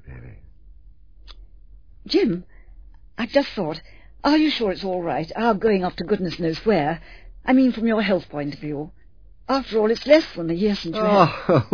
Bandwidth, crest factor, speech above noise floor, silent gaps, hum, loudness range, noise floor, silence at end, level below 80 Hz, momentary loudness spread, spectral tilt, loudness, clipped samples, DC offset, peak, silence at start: 5.4 kHz; 22 dB; 28 dB; none; none; 5 LU; -49 dBFS; 0.05 s; -46 dBFS; 14 LU; -7 dB/octave; -21 LUFS; under 0.1%; 0.4%; 0 dBFS; 0.05 s